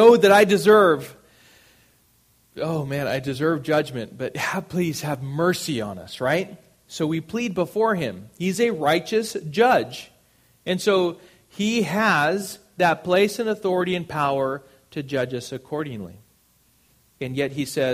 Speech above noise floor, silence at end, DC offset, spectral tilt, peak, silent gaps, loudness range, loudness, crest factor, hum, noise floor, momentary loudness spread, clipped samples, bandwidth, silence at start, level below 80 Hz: 39 dB; 0 s; under 0.1%; -5 dB/octave; -2 dBFS; none; 5 LU; -22 LUFS; 20 dB; none; -61 dBFS; 15 LU; under 0.1%; 15.5 kHz; 0 s; -60 dBFS